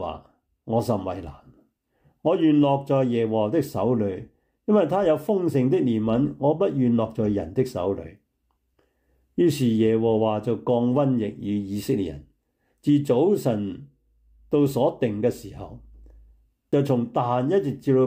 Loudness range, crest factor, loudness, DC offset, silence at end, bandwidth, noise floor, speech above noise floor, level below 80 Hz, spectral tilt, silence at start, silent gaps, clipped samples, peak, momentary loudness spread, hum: 3 LU; 14 dB; -23 LUFS; under 0.1%; 0 s; 16 kHz; -72 dBFS; 50 dB; -56 dBFS; -8 dB/octave; 0 s; none; under 0.1%; -8 dBFS; 13 LU; none